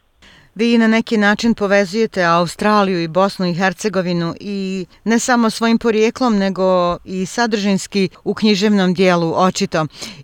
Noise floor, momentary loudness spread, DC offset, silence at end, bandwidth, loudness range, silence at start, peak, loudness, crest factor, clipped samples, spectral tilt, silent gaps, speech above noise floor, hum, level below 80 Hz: -48 dBFS; 7 LU; under 0.1%; 0 s; 15 kHz; 2 LU; 0.55 s; -2 dBFS; -16 LUFS; 14 dB; under 0.1%; -5 dB/octave; none; 32 dB; none; -50 dBFS